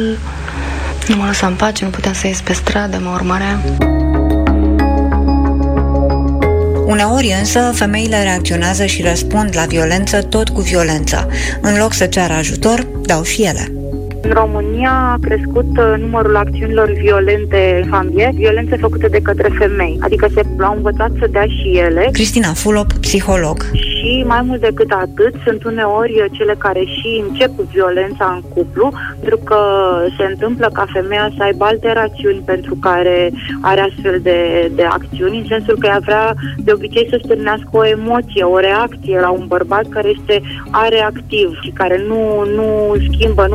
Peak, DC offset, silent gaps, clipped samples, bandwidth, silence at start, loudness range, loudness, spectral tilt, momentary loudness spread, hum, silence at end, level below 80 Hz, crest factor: -2 dBFS; under 0.1%; none; under 0.1%; 16 kHz; 0 s; 2 LU; -14 LUFS; -5 dB/octave; 5 LU; none; 0 s; -22 dBFS; 12 dB